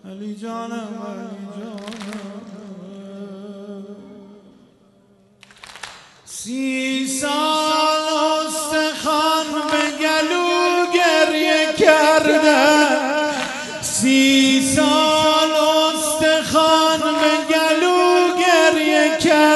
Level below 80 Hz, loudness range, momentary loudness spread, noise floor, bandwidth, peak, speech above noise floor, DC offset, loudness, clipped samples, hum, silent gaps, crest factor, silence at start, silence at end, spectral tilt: -58 dBFS; 19 LU; 21 LU; -54 dBFS; 12.5 kHz; 0 dBFS; 28 dB; under 0.1%; -16 LUFS; under 0.1%; none; none; 18 dB; 0.05 s; 0 s; -2.5 dB/octave